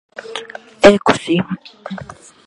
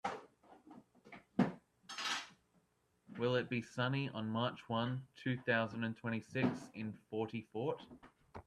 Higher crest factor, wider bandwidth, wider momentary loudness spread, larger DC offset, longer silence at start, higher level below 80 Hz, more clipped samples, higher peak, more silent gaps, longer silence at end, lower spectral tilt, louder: second, 16 dB vs 24 dB; second, 11.5 kHz vs 13 kHz; about the same, 21 LU vs 20 LU; neither; first, 0.25 s vs 0.05 s; first, -46 dBFS vs -76 dBFS; first, 0.2% vs under 0.1%; first, 0 dBFS vs -18 dBFS; neither; first, 0.4 s vs 0.05 s; about the same, -5 dB/octave vs -5.5 dB/octave; first, -13 LUFS vs -40 LUFS